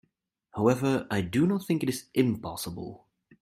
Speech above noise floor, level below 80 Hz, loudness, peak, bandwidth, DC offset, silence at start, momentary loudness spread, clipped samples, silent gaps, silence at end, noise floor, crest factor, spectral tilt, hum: 46 dB; -60 dBFS; -28 LUFS; -10 dBFS; 16 kHz; under 0.1%; 0.55 s; 13 LU; under 0.1%; none; 0.45 s; -74 dBFS; 20 dB; -6 dB/octave; none